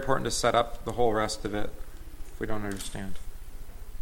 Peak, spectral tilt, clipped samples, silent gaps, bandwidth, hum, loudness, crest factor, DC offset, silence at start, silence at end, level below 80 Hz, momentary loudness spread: -10 dBFS; -4 dB/octave; under 0.1%; none; 17 kHz; none; -30 LUFS; 20 dB; under 0.1%; 0 s; 0 s; -40 dBFS; 22 LU